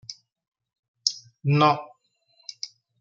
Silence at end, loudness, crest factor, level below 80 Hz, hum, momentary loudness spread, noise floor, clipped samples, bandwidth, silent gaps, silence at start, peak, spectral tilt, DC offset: 0.35 s; -24 LUFS; 26 dB; -70 dBFS; none; 22 LU; -66 dBFS; under 0.1%; 7.6 kHz; 0.48-0.52 s, 0.79-0.94 s; 0.1 s; -2 dBFS; -4.5 dB/octave; under 0.1%